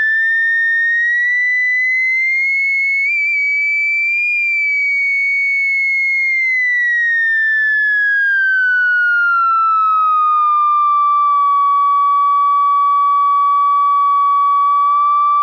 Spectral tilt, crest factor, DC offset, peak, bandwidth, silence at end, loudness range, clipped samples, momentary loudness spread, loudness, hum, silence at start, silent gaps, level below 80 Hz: 4.5 dB/octave; 4 dB; under 0.1%; -10 dBFS; 7.4 kHz; 0 s; 1 LU; under 0.1%; 1 LU; -12 LUFS; 50 Hz at -80 dBFS; 0 s; none; -78 dBFS